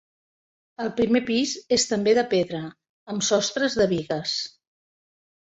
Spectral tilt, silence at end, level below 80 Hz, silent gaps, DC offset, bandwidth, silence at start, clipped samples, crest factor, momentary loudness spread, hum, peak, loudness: -3.5 dB/octave; 1.05 s; -58 dBFS; 2.89-3.06 s; under 0.1%; 8.2 kHz; 0.8 s; under 0.1%; 18 dB; 12 LU; none; -8 dBFS; -24 LUFS